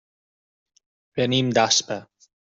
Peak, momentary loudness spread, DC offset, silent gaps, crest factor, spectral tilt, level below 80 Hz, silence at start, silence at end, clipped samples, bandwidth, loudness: -4 dBFS; 15 LU; under 0.1%; none; 22 dB; -3 dB/octave; -62 dBFS; 1.15 s; 0.45 s; under 0.1%; 8.2 kHz; -20 LUFS